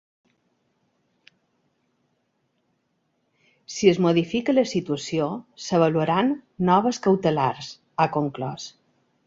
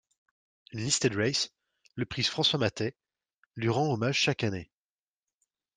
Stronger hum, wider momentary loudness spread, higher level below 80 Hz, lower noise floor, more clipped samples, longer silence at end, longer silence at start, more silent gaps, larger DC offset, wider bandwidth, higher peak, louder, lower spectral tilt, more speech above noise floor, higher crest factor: neither; about the same, 13 LU vs 13 LU; about the same, -62 dBFS vs -64 dBFS; second, -72 dBFS vs under -90 dBFS; neither; second, 0.55 s vs 1.1 s; first, 3.7 s vs 0.7 s; second, none vs 3.38-3.50 s; neither; second, 7.8 kHz vs 10 kHz; first, -4 dBFS vs -12 dBFS; first, -23 LUFS vs -29 LUFS; first, -6 dB/octave vs -3.5 dB/octave; second, 50 dB vs over 61 dB; about the same, 20 dB vs 20 dB